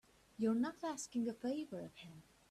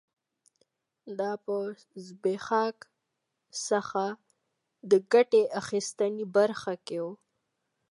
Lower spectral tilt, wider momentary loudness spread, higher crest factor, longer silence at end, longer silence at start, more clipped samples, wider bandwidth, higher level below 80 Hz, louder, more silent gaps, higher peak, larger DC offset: about the same, -5 dB/octave vs -4 dB/octave; first, 20 LU vs 17 LU; about the same, 16 dB vs 20 dB; second, 0.3 s vs 0.75 s; second, 0.4 s vs 1.05 s; neither; first, 13.5 kHz vs 11.5 kHz; about the same, -78 dBFS vs -78 dBFS; second, -41 LUFS vs -29 LUFS; neither; second, -26 dBFS vs -10 dBFS; neither